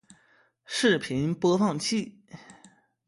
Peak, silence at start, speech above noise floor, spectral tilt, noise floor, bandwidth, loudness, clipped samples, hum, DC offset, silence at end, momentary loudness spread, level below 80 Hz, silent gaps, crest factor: -8 dBFS; 0.7 s; 39 dB; -4.5 dB/octave; -64 dBFS; 11.5 kHz; -26 LUFS; under 0.1%; none; under 0.1%; 0.55 s; 12 LU; -64 dBFS; none; 20 dB